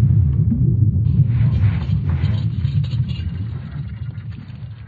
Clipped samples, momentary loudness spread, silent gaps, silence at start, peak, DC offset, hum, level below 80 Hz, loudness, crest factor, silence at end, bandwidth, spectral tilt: under 0.1%; 13 LU; none; 0 s; -4 dBFS; under 0.1%; none; -30 dBFS; -19 LUFS; 14 dB; 0 s; 4.8 kHz; -9.5 dB/octave